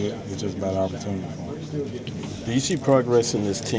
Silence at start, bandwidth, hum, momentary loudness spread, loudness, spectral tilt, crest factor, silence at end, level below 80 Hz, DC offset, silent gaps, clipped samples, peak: 0 s; 8 kHz; none; 12 LU; -25 LUFS; -5.5 dB/octave; 18 dB; 0 s; -48 dBFS; under 0.1%; none; under 0.1%; -6 dBFS